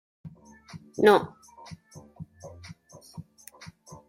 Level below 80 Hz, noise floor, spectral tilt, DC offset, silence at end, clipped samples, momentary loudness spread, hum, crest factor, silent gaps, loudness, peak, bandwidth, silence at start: -66 dBFS; -50 dBFS; -5.5 dB/octave; under 0.1%; 0.85 s; under 0.1%; 29 LU; none; 26 dB; none; -22 LUFS; -6 dBFS; 16 kHz; 0.25 s